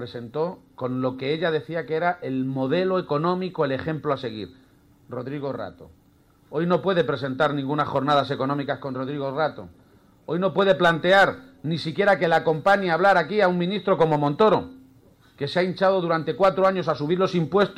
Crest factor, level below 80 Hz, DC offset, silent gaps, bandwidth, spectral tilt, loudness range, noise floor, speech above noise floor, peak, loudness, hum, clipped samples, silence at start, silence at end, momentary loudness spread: 18 dB; -60 dBFS; under 0.1%; none; 11.5 kHz; -7 dB/octave; 8 LU; -58 dBFS; 35 dB; -6 dBFS; -23 LUFS; none; under 0.1%; 0 s; 0 s; 12 LU